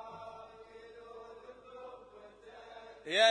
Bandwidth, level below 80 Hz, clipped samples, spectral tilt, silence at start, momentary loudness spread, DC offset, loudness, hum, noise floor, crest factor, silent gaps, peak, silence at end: 10.5 kHz; -74 dBFS; under 0.1%; -1 dB/octave; 0 s; 13 LU; under 0.1%; -38 LUFS; 50 Hz at -70 dBFS; -55 dBFS; 24 dB; none; -12 dBFS; 0 s